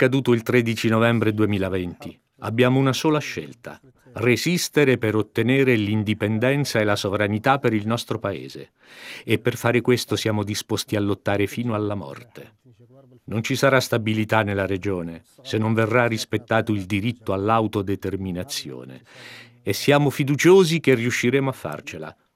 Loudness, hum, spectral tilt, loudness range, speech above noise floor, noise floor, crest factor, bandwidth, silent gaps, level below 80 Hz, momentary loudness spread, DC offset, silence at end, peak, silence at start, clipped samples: -21 LUFS; none; -5.5 dB/octave; 4 LU; 29 dB; -51 dBFS; 18 dB; 16 kHz; none; -64 dBFS; 17 LU; under 0.1%; 0.25 s; -2 dBFS; 0 s; under 0.1%